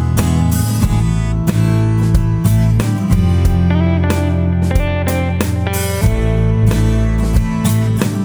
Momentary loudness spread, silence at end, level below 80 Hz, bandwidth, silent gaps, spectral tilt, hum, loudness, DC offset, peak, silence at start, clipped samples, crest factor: 3 LU; 0 s; -20 dBFS; over 20 kHz; none; -6.5 dB/octave; none; -15 LUFS; under 0.1%; 0 dBFS; 0 s; under 0.1%; 12 dB